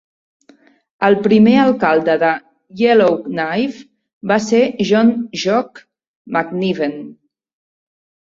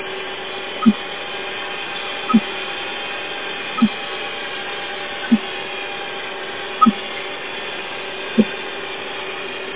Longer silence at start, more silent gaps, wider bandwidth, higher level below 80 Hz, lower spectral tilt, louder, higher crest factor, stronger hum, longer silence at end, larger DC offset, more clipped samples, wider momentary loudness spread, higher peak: first, 1 s vs 0 s; first, 4.13-4.21 s, 6.08-6.25 s vs none; first, 7.6 kHz vs 4 kHz; first, -58 dBFS vs -64 dBFS; first, -6 dB/octave vs -2.5 dB/octave; first, -15 LUFS vs -22 LUFS; second, 16 dB vs 22 dB; neither; first, 1.25 s vs 0 s; second, under 0.1% vs 1%; neither; first, 12 LU vs 9 LU; about the same, -2 dBFS vs 0 dBFS